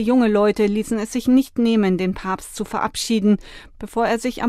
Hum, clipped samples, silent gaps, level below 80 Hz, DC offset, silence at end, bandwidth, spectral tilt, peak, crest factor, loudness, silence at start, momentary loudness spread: none; under 0.1%; none; -44 dBFS; under 0.1%; 0 s; 14.5 kHz; -5.5 dB/octave; -6 dBFS; 14 dB; -20 LUFS; 0 s; 10 LU